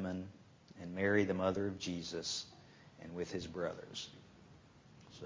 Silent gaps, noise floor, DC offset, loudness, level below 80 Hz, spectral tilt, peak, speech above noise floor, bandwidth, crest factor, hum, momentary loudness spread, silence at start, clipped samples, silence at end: none; -61 dBFS; under 0.1%; -39 LUFS; -64 dBFS; -4.5 dB/octave; -18 dBFS; 23 dB; 7.6 kHz; 22 dB; none; 24 LU; 0 s; under 0.1%; 0 s